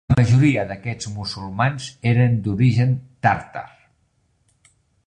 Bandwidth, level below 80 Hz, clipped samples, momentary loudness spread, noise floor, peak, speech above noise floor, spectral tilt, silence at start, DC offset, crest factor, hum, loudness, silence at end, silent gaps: 9.6 kHz; -44 dBFS; under 0.1%; 12 LU; -65 dBFS; -2 dBFS; 46 dB; -7 dB/octave; 0.1 s; under 0.1%; 18 dB; none; -20 LUFS; 1.4 s; none